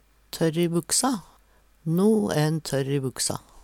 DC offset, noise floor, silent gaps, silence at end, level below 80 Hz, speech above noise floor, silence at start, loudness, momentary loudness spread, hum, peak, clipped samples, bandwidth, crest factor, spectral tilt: under 0.1%; -59 dBFS; none; 0.05 s; -58 dBFS; 35 dB; 0.35 s; -24 LUFS; 7 LU; none; -10 dBFS; under 0.1%; 17.5 kHz; 16 dB; -4.5 dB/octave